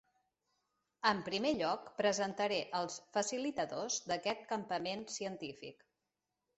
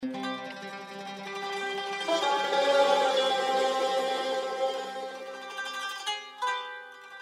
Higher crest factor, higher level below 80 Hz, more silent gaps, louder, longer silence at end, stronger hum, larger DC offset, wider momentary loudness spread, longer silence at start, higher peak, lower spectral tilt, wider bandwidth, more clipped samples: about the same, 22 dB vs 18 dB; first, -76 dBFS vs -90 dBFS; neither; second, -37 LUFS vs -29 LUFS; first, 0.85 s vs 0 s; neither; neither; second, 8 LU vs 16 LU; first, 1.05 s vs 0 s; second, -16 dBFS vs -12 dBFS; about the same, -3 dB/octave vs -2 dB/octave; second, 8.2 kHz vs 15.5 kHz; neither